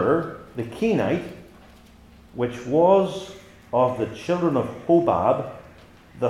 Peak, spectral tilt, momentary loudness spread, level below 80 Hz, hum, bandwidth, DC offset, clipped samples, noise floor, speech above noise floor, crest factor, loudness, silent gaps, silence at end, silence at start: -6 dBFS; -7.5 dB/octave; 17 LU; -56 dBFS; none; 12 kHz; under 0.1%; under 0.1%; -49 dBFS; 28 dB; 18 dB; -23 LUFS; none; 0 s; 0 s